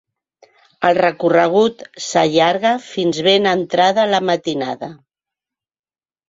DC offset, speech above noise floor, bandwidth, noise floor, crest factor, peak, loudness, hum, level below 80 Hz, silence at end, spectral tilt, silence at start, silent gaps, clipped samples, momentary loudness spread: under 0.1%; over 74 dB; 7.8 kHz; under -90 dBFS; 16 dB; 0 dBFS; -16 LUFS; none; -60 dBFS; 1.35 s; -4.5 dB/octave; 0.8 s; none; under 0.1%; 9 LU